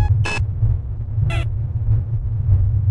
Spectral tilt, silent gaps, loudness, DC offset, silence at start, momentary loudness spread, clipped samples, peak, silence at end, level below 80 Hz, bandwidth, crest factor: -6.5 dB/octave; none; -21 LUFS; under 0.1%; 0 s; 6 LU; under 0.1%; -4 dBFS; 0 s; -24 dBFS; 10 kHz; 14 dB